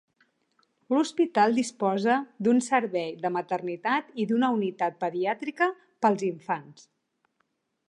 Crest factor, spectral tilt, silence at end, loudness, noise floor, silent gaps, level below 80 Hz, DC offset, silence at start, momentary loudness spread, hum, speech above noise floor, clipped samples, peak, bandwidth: 18 dB; -5 dB/octave; 1.2 s; -27 LUFS; -75 dBFS; none; -80 dBFS; under 0.1%; 0.9 s; 7 LU; none; 49 dB; under 0.1%; -8 dBFS; 11.5 kHz